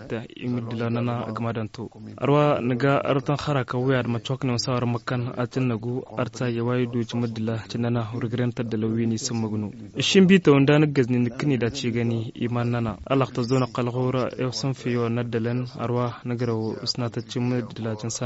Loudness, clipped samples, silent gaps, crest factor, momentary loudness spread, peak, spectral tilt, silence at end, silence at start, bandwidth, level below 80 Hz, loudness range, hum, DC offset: -24 LUFS; under 0.1%; none; 20 dB; 9 LU; -4 dBFS; -6 dB/octave; 0 s; 0 s; 8 kHz; -56 dBFS; 6 LU; none; under 0.1%